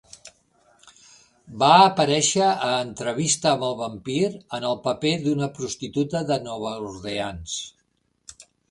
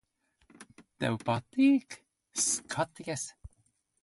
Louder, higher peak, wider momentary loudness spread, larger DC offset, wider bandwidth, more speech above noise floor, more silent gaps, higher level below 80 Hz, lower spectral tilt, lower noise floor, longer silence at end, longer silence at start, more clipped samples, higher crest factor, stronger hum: first, -22 LUFS vs -31 LUFS; first, 0 dBFS vs -16 dBFS; about the same, 14 LU vs 15 LU; neither; about the same, 11.5 kHz vs 11.5 kHz; about the same, 45 dB vs 42 dB; neither; first, -56 dBFS vs -62 dBFS; about the same, -3.5 dB/octave vs -4 dB/octave; second, -68 dBFS vs -72 dBFS; second, 0.4 s vs 0.55 s; second, 0.25 s vs 0.6 s; neither; about the same, 22 dB vs 18 dB; first, 60 Hz at -50 dBFS vs none